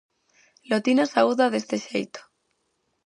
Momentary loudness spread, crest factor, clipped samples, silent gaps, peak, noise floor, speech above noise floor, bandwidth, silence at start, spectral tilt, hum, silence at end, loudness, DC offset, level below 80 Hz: 12 LU; 20 dB; under 0.1%; none; -6 dBFS; -74 dBFS; 51 dB; 11 kHz; 0.7 s; -4.5 dB/octave; none; 0.85 s; -23 LUFS; under 0.1%; -78 dBFS